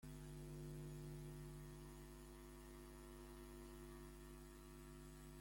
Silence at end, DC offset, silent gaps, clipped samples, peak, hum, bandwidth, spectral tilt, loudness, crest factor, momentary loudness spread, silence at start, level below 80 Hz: 0 s; under 0.1%; none; under 0.1%; -44 dBFS; none; 16.5 kHz; -5.5 dB/octave; -58 LUFS; 12 dB; 6 LU; 0 s; -62 dBFS